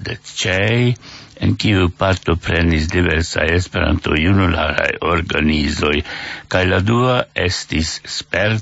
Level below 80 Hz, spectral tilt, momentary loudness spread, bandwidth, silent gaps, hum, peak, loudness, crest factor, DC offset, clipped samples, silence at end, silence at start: -30 dBFS; -5.5 dB/octave; 6 LU; 8 kHz; none; none; 0 dBFS; -17 LUFS; 16 dB; under 0.1%; under 0.1%; 0 s; 0 s